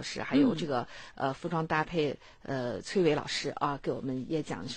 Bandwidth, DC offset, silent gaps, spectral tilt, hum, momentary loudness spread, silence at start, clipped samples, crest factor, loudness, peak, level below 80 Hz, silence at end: 9.8 kHz; under 0.1%; none; -5.5 dB/octave; none; 8 LU; 0 s; under 0.1%; 16 dB; -31 LUFS; -14 dBFS; -58 dBFS; 0 s